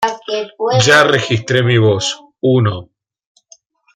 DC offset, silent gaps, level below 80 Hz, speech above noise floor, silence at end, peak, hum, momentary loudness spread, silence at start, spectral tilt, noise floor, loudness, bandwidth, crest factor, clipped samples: under 0.1%; none; -52 dBFS; 36 dB; 1.1 s; 0 dBFS; none; 12 LU; 0 s; -4.5 dB/octave; -49 dBFS; -13 LUFS; 13.5 kHz; 14 dB; under 0.1%